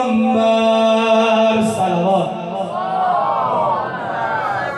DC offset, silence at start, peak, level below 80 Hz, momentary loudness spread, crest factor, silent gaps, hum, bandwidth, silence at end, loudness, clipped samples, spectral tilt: under 0.1%; 0 s; -4 dBFS; -60 dBFS; 8 LU; 12 dB; none; none; 12 kHz; 0 s; -16 LUFS; under 0.1%; -5.5 dB/octave